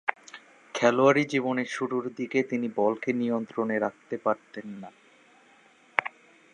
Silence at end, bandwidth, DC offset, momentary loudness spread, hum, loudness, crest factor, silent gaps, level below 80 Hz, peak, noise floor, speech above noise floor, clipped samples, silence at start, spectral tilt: 0.45 s; 10 kHz; under 0.1%; 20 LU; none; -27 LUFS; 28 dB; none; -80 dBFS; -2 dBFS; -59 dBFS; 32 dB; under 0.1%; 0.05 s; -5.5 dB/octave